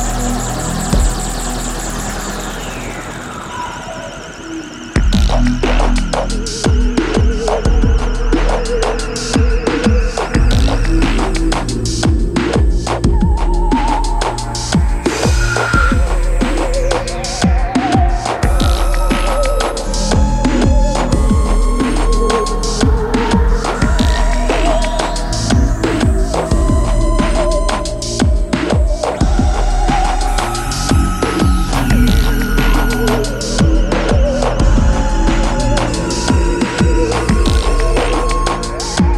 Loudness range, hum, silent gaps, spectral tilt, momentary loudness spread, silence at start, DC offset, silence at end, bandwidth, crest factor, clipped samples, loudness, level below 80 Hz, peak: 3 LU; none; none; -5 dB/octave; 6 LU; 0 s; under 0.1%; 0 s; 13.5 kHz; 12 dB; under 0.1%; -15 LUFS; -16 dBFS; 0 dBFS